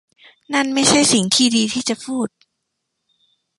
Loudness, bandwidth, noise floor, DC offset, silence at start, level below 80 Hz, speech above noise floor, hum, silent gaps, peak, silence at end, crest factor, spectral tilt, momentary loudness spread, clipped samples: -16 LUFS; 11.5 kHz; -76 dBFS; under 0.1%; 0.5 s; -58 dBFS; 59 dB; none; none; 0 dBFS; 1.3 s; 20 dB; -2.5 dB/octave; 11 LU; under 0.1%